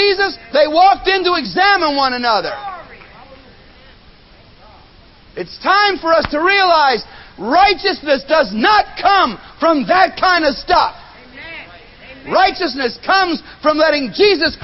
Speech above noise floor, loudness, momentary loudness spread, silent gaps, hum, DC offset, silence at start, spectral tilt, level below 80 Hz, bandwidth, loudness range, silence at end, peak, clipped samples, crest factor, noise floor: 30 dB; -14 LUFS; 17 LU; none; none; under 0.1%; 0 s; -6 dB/octave; -44 dBFS; 6 kHz; 8 LU; 0.05 s; 0 dBFS; under 0.1%; 16 dB; -44 dBFS